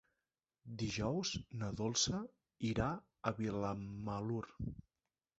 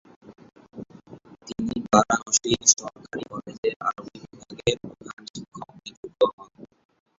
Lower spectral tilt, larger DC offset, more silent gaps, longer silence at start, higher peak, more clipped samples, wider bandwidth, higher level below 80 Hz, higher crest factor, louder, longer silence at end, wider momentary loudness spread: first, -5 dB/octave vs -2.5 dB/octave; neither; second, none vs 3.58-3.63 s, 3.76-3.80 s, 5.13-5.17 s, 5.30-5.34 s, 5.97-6.03 s, 6.33-6.38 s; first, 0.65 s vs 0.25 s; second, -20 dBFS vs -2 dBFS; neither; about the same, 8 kHz vs 8 kHz; about the same, -58 dBFS vs -56 dBFS; about the same, 22 dB vs 26 dB; second, -40 LUFS vs -23 LUFS; about the same, 0.6 s vs 0.55 s; second, 12 LU vs 25 LU